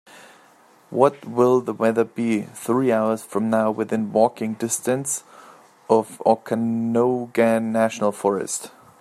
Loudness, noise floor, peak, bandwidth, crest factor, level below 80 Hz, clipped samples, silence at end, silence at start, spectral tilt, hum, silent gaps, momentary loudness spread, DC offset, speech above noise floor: -21 LUFS; -53 dBFS; -2 dBFS; 14.5 kHz; 20 dB; -70 dBFS; under 0.1%; 0.35 s; 0.15 s; -5.5 dB/octave; none; none; 6 LU; under 0.1%; 32 dB